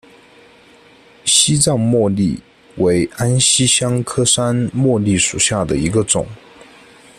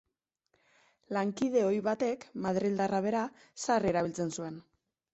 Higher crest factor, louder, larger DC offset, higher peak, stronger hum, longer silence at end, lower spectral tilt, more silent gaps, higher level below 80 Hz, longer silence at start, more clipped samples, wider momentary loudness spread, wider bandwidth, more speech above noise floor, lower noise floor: about the same, 16 dB vs 16 dB; first, -15 LUFS vs -32 LUFS; neither; first, 0 dBFS vs -16 dBFS; neither; first, 0.85 s vs 0.55 s; second, -3.5 dB/octave vs -5.5 dB/octave; neither; first, -44 dBFS vs -68 dBFS; first, 1.25 s vs 1.1 s; neither; second, 7 LU vs 11 LU; first, 14.5 kHz vs 8.2 kHz; second, 31 dB vs 48 dB; second, -46 dBFS vs -79 dBFS